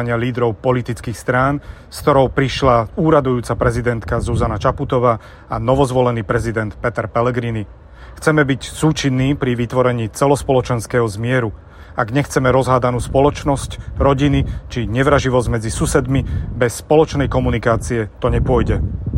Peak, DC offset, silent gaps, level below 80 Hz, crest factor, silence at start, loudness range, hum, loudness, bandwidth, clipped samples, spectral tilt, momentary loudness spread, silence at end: 0 dBFS; under 0.1%; none; -30 dBFS; 16 dB; 0 s; 2 LU; none; -17 LUFS; 16 kHz; under 0.1%; -6.5 dB/octave; 8 LU; 0 s